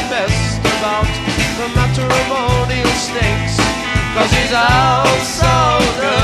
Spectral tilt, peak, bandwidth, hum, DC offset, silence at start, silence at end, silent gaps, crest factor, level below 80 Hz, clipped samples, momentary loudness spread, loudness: -4.5 dB/octave; 0 dBFS; 14.5 kHz; none; under 0.1%; 0 s; 0 s; none; 14 dB; -26 dBFS; under 0.1%; 5 LU; -14 LUFS